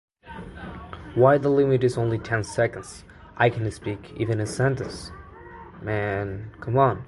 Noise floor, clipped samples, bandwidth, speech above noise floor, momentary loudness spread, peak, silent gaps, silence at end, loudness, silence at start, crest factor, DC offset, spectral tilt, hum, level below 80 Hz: -43 dBFS; under 0.1%; 11.5 kHz; 20 dB; 22 LU; -4 dBFS; none; 0 s; -24 LUFS; 0.25 s; 20 dB; under 0.1%; -7 dB/octave; none; -48 dBFS